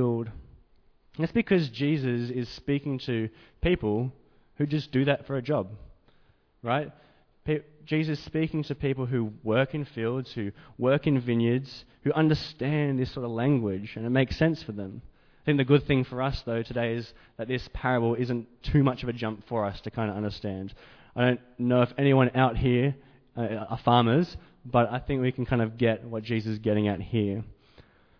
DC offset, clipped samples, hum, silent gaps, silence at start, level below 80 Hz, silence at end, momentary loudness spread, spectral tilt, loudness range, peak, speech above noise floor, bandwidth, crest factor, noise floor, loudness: under 0.1%; under 0.1%; none; none; 0 s; -48 dBFS; 0.65 s; 12 LU; -8.5 dB/octave; 4 LU; -8 dBFS; 35 dB; 5.4 kHz; 20 dB; -62 dBFS; -28 LUFS